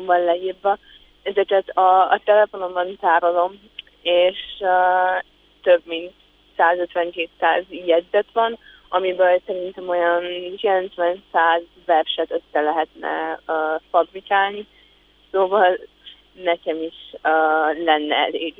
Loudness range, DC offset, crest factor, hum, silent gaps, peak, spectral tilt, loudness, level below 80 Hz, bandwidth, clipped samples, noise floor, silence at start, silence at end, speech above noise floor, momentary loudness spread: 3 LU; under 0.1%; 18 dB; none; none; -4 dBFS; -6 dB/octave; -20 LUFS; -60 dBFS; 4.1 kHz; under 0.1%; -55 dBFS; 0 s; 0.1 s; 35 dB; 10 LU